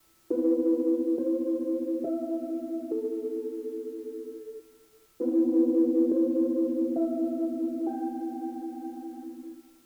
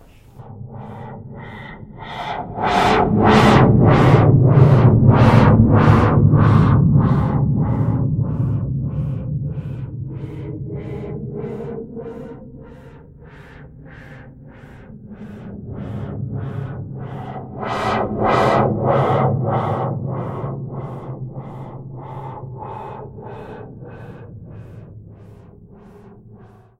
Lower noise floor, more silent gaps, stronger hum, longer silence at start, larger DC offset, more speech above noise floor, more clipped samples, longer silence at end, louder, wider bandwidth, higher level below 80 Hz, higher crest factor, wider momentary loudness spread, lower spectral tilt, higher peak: first, -59 dBFS vs -44 dBFS; neither; neither; about the same, 0.3 s vs 0.35 s; neither; first, 30 dB vs 15 dB; neither; second, 0.25 s vs 0.7 s; second, -29 LUFS vs -16 LUFS; second, 2 kHz vs 9.4 kHz; second, -78 dBFS vs -34 dBFS; about the same, 16 dB vs 18 dB; second, 16 LU vs 24 LU; about the same, -7.5 dB/octave vs -8.5 dB/octave; second, -14 dBFS vs 0 dBFS